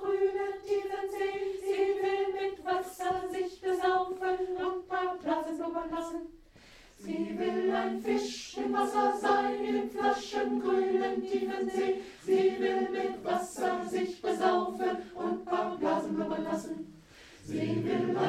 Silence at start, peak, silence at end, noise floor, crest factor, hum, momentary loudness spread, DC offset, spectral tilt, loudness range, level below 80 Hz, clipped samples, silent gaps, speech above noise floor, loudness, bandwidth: 0 s; -14 dBFS; 0 s; -56 dBFS; 18 dB; none; 8 LU; under 0.1%; -5 dB/octave; 4 LU; -64 dBFS; under 0.1%; none; 25 dB; -32 LUFS; 14 kHz